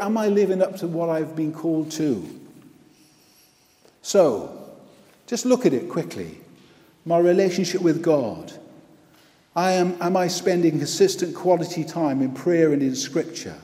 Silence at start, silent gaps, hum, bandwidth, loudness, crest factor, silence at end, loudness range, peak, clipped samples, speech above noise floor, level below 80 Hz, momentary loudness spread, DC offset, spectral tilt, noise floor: 0 s; none; none; 15.5 kHz; -22 LUFS; 18 dB; 0 s; 5 LU; -4 dBFS; under 0.1%; 36 dB; -68 dBFS; 12 LU; under 0.1%; -5.5 dB/octave; -57 dBFS